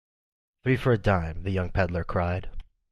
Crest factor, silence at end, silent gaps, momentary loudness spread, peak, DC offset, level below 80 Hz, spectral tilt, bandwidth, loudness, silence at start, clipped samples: 18 dB; 0.3 s; none; 9 LU; -8 dBFS; under 0.1%; -40 dBFS; -8.5 dB/octave; 11.5 kHz; -27 LUFS; 0.65 s; under 0.1%